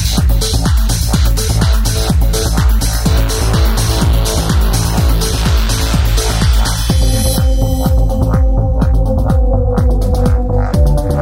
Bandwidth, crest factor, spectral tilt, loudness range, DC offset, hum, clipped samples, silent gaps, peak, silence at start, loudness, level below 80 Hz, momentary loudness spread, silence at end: 16.5 kHz; 10 dB; -5 dB/octave; 0 LU; under 0.1%; none; under 0.1%; none; 0 dBFS; 0 s; -13 LUFS; -12 dBFS; 1 LU; 0 s